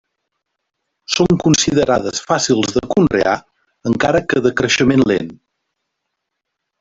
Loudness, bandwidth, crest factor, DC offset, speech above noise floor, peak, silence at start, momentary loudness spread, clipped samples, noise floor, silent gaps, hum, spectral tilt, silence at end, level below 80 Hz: -15 LUFS; 8 kHz; 16 dB; under 0.1%; 62 dB; 0 dBFS; 1.1 s; 8 LU; under 0.1%; -77 dBFS; none; none; -4.5 dB/octave; 1.45 s; -44 dBFS